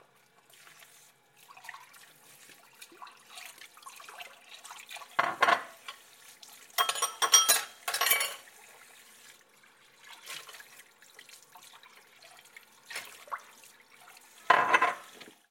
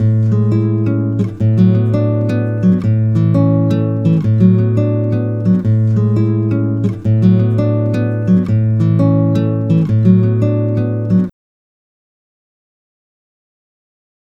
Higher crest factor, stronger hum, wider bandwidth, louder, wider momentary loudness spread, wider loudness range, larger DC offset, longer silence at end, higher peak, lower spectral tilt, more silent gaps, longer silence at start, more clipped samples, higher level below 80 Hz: first, 30 dB vs 14 dB; neither; first, 17 kHz vs 4.1 kHz; second, -27 LUFS vs -14 LUFS; first, 28 LU vs 5 LU; first, 22 LU vs 4 LU; neither; second, 0.2 s vs 3 s; second, -4 dBFS vs 0 dBFS; second, 1.5 dB/octave vs -11 dB/octave; neither; first, 1.65 s vs 0 s; neither; second, -90 dBFS vs -44 dBFS